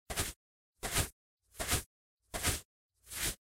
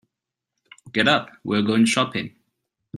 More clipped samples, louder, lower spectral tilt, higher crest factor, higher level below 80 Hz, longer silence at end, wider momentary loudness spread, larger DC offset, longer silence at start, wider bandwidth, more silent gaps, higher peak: neither; second, -37 LUFS vs -21 LUFS; second, -2 dB/octave vs -4 dB/octave; about the same, 22 dB vs 22 dB; first, -50 dBFS vs -64 dBFS; second, 0.15 s vs 0.7 s; first, 16 LU vs 10 LU; neither; second, 0.1 s vs 0.85 s; first, 16 kHz vs 12 kHz; first, 0.36-0.73 s, 1.12-1.37 s, 1.86-2.17 s, 2.65-2.90 s vs none; second, -18 dBFS vs -2 dBFS